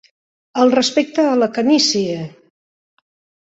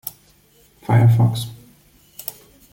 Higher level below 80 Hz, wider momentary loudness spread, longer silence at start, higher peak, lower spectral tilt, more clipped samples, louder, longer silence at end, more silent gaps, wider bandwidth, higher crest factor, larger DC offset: second, -64 dBFS vs -52 dBFS; second, 13 LU vs 19 LU; first, 0.55 s vs 0.05 s; about the same, -2 dBFS vs -4 dBFS; second, -3.5 dB/octave vs -7 dB/octave; neither; about the same, -16 LUFS vs -17 LUFS; first, 1.15 s vs 0.4 s; neither; second, 8 kHz vs 17 kHz; about the same, 16 dB vs 16 dB; neither